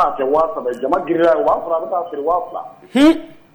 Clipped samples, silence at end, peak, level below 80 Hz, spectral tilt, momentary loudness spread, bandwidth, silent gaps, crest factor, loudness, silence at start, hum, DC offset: under 0.1%; 0.2 s; -4 dBFS; -48 dBFS; -5.5 dB/octave; 9 LU; over 20 kHz; none; 12 dB; -17 LUFS; 0 s; none; under 0.1%